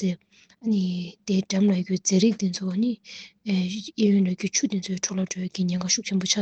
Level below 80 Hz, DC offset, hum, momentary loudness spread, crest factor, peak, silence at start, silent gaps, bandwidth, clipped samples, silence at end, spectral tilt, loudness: -68 dBFS; under 0.1%; none; 9 LU; 16 dB; -8 dBFS; 0 s; none; 8.4 kHz; under 0.1%; 0 s; -4.5 dB/octave; -25 LUFS